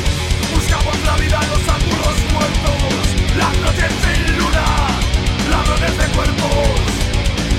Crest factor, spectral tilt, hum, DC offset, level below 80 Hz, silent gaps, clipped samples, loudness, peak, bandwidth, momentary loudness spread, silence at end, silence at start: 12 dB; -4.5 dB/octave; none; 0.1%; -18 dBFS; none; under 0.1%; -16 LUFS; -4 dBFS; 16 kHz; 2 LU; 0 s; 0 s